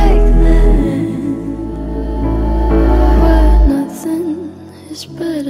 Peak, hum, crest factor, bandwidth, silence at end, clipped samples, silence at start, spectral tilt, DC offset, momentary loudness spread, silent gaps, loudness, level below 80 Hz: 0 dBFS; none; 10 dB; 12 kHz; 0 s; under 0.1%; 0 s; -8 dB/octave; under 0.1%; 14 LU; none; -14 LUFS; -12 dBFS